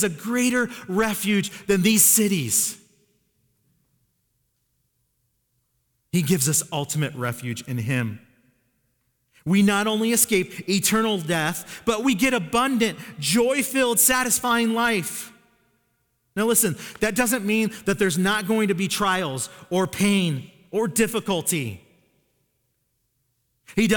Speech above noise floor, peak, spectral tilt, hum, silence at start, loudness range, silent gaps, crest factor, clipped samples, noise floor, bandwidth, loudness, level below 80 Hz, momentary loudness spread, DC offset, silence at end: 50 dB; -4 dBFS; -3.5 dB/octave; none; 0 s; 7 LU; none; 20 dB; under 0.1%; -72 dBFS; 19.5 kHz; -22 LUFS; -56 dBFS; 10 LU; under 0.1%; 0 s